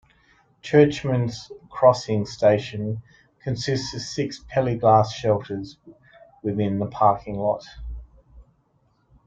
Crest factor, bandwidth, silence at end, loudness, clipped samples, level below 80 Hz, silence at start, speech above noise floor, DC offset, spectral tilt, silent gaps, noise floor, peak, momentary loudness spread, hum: 20 dB; 7.8 kHz; 0.85 s; -22 LUFS; under 0.1%; -48 dBFS; 0.65 s; 43 dB; under 0.1%; -6.5 dB/octave; none; -65 dBFS; -2 dBFS; 20 LU; none